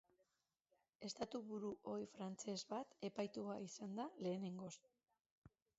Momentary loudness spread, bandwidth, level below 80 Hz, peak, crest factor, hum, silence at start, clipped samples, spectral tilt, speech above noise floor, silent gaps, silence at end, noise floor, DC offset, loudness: 6 LU; 8 kHz; -86 dBFS; -32 dBFS; 18 dB; none; 1 s; under 0.1%; -5.5 dB/octave; 40 dB; 5.31-5.42 s; 0.3 s; -89 dBFS; under 0.1%; -49 LUFS